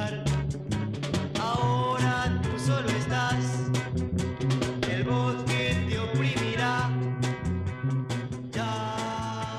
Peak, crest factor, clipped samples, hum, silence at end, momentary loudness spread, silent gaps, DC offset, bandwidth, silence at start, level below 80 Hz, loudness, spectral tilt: -12 dBFS; 16 dB; under 0.1%; none; 0 s; 5 LU; none; under 0.1%; 12 kHz; 0 s; -46 dBFS; -28 LUFS; -5.5 dB/octave